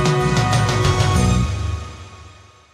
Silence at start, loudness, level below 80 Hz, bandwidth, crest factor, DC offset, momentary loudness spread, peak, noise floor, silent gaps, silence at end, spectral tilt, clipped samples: 0 s; -18 LUFS; -28 dBFS; 14 kHz; 14 dB; under 0.1%; 14 LU; -4 dBFS; -44 dBFS; none; 0.45 s; -5.5 dB/octave; under 0.1%